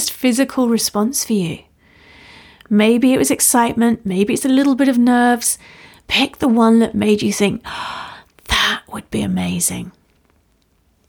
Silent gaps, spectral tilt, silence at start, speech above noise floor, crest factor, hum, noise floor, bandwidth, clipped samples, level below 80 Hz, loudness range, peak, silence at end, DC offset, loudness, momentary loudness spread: none; -3.5 dB/octave; 0 s; 44 dB; 16 dB; none; -59 dBFS; 20 kHz; under 0.1%; -44 dBFS; 6 LU; -2 dBFS; 1.2 s; under 0.1%; -16 LUFS; 13 LU